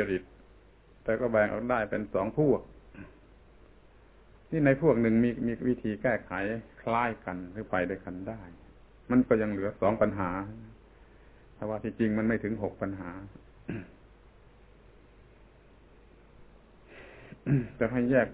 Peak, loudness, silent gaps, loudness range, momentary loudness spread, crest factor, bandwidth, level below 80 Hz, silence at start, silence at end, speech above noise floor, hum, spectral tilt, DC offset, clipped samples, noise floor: -10 dBFS; -30 LUFS; none; 10 LU; 21 LU; 20 dB; 4 kHz; -54 dBFS; 0 s; 0 s; 28 dB; none; -7.5 dB/octave; under 0.1%; under 0.1%; -57 dBFS